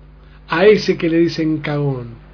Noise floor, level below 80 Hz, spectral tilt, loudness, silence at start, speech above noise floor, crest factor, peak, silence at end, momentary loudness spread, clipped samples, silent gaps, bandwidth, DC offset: -41 dBFS; -44 dBFS; -7 dB/octave; -16 LUFS; 0.5 s; 26 dB; 16 dB; 0 dBFS; 0.15 s; 10 LU; under 0.1%; none; 5.4 kHz; under 0.1%